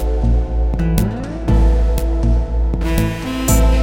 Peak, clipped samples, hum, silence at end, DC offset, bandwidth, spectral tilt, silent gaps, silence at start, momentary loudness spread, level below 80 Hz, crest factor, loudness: 0 dBFS; under 0.1%; none; 0 s; under 0.1%; 17 kHz; -6 dB/octave; none; 0 s; 5 LU; -16 dBFS; 14 dB; -18 LUFS